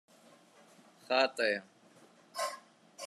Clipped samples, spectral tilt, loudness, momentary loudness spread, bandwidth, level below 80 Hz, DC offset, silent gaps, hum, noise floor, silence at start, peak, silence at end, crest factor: under 0.1%; -1.5 dB/octave; -33 LUFS; 14 LU; 13.5 kHz; under -90 dBFS; under 0.1%; none; none; -62 dBFS; 1.1 s; -12 dBFS; 0 s; 26 dB